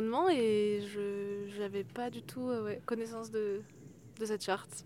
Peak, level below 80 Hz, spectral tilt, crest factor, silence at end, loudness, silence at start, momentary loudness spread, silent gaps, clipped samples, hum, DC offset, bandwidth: -18 dBFS; -76 dBFS; -5 dB/octave; 16 dB; 0 s; -36 LUFS; 0 s; 12 LU; none; under 0.1%; none; under 0.1%; 15.5 kHz